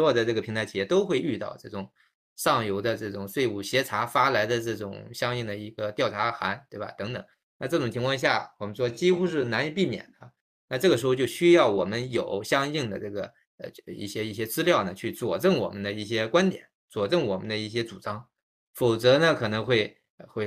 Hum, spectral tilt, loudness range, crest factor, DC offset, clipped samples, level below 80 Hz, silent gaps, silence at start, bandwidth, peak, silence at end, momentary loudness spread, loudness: none; -5 dB/octave; 4 LU; 20 dB; under 0.1%; under 0.1%; -64 dBFS; 2.14-2.36 s, 7.43-7.60 s, 10.41-10.68 s, 13.46-13.58 s, 16.75-16.88 s, 18.42-18.74 s, 20.10-20.18 s; 0 s; 15.5 kHz; -6 dBFS; 0 s; 14 LU; -26 LUFS